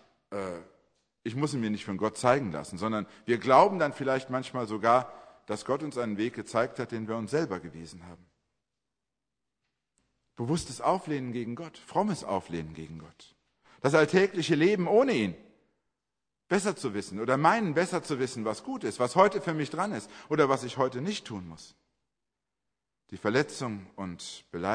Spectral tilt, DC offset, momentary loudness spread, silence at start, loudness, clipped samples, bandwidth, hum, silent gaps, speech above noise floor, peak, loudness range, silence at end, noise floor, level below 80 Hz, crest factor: -5.5 dB/octave; under 0.1%; 17 LU; 0.3 s; -29 LUFS; under 0.1%; 10.5 kHz; none; none; 59 dB; -6 dBFS; 8 LU; 0 s; -88 dBFS; -66 dBFS; 24 dB